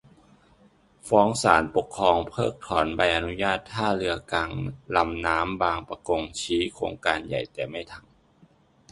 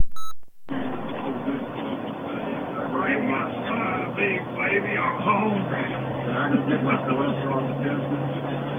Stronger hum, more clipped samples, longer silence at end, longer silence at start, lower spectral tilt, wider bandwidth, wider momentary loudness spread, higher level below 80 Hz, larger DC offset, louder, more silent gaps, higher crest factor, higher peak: neither; neither; first, 0.9 s vs 0 s; first, 1.05 s vs 0 s; second, -4.5 dB/octave vs -8 dB/octave; second, 11.5 kHz vs 16.5 kHz; first, 11 LU vs 8 LU; first, -48 dBFS vs -54 dBFS; neither; about the same, -25 LUFS vs -26 LUFS; neither; first, 24 dB vs 18 dB; first, -2 dBFS vs -6 dBFS